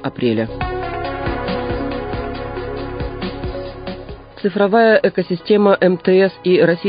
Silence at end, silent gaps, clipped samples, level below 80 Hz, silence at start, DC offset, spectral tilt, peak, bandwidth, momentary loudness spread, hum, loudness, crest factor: 0 s; none; under 0.1%; -34 dBFS; 0 s; under 0.1%; -12 dB/octave; -2 dBFS; 5.2 kHz; 14 LU; none; -17 LUFS; 16 dB